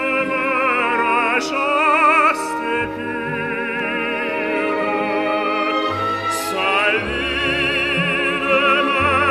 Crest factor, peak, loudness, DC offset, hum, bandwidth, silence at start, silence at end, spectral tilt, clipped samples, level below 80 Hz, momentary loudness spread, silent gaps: 16 dB; -4 dBFS; -18 LUFS; under 0.1%; none; 15.5 kHz; 0 s; 0 s; -4 dB/octave; under 0.1%; -46 dBFS; 7 LU; none